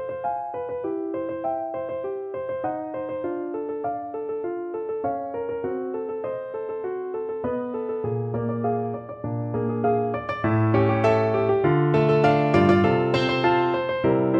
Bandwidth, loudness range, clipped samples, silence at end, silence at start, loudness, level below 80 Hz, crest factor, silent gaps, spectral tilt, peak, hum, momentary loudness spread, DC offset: 8 kHz; 9 LU; under 0.1%; 0 s; 0 s; -25 LUFS; -54 dBFS; 20 dB; none; -8.5 dB/octave; -4 dBFS; none; 11 LU; under 0.1%